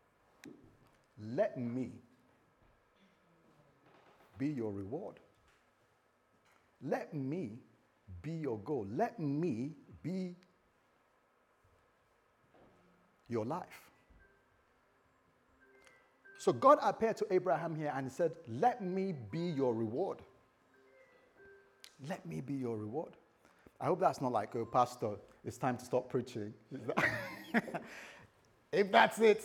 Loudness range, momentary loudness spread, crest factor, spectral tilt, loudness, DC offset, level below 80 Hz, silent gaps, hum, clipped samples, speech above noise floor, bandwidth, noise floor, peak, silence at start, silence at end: 14 LU; 19 LU; 26 dB; -6 dB/octave; -36 LUFS; under 0.1%; -78 dBFS; none; none; under 0.1%; 38 dB; 17.5 kHz; -73 dBFS; -12 dBFS; 0.45 s; 0 s